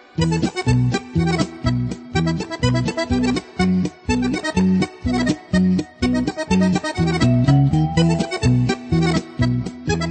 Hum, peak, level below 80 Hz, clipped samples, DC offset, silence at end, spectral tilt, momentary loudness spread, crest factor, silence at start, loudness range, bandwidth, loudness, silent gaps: none; -2 dBFS; -34 dBFS; under 0.1%; under 0.1%; 0 s; -6.5 dB/octave; 5 LU; 16 dB; 0.15 s; 3 LU; 8.8 kHz; -19 LUFS; none